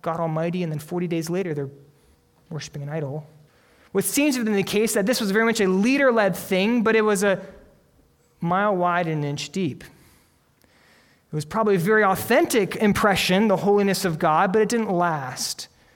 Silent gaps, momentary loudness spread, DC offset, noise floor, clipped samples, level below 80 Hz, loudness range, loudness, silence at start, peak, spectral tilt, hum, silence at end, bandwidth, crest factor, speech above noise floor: none; 12 LU; under 0.1%; -60 dBFS; under 0.1%; -56 dBFS; 8 LU; -22 LUFS; 0.05 s; -6 dBFS; -5 dB/octave; none; 0.3 s; 19 kHz; 18 dB; 39 dB